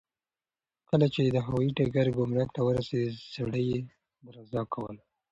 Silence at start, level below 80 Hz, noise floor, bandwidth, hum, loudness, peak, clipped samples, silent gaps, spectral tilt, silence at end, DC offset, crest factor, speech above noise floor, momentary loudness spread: 0.9 s; -58 dBFS; under -90 dBFS; 7.8 kHz; none; -29 LUFS; -12 dBFS; under 0.1%; none; -8.5 dB/octave; 0.35 s; under 0.1%; 18 dB; over 61 dB; 11 LU